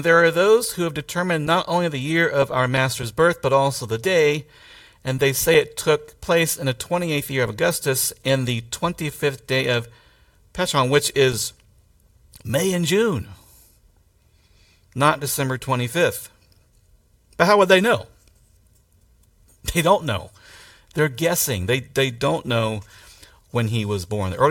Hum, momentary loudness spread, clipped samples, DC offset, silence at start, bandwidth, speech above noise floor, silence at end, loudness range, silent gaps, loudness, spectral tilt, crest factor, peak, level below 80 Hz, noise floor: none; 10 LU; under 0.1%; under 0.1%; 0 s; 17 kHz; 38 dB; 0 s; 4 LU; none; -20 LUFS; -4 dB/octave; 22 dB; 0 dBFS; -50 dBFS; -58 dBFS